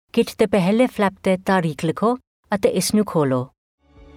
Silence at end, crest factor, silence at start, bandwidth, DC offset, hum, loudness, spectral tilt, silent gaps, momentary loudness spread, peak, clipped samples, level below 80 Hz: 0.7 s; 16 dB; 0.15 s; 16.5 kHz; under 0.1%; none; -20 LUFS; -5.5 dB/octave; 2.27-2.43 s; 7 LU; -6 dBFS; under 0.1%; -54 dBFS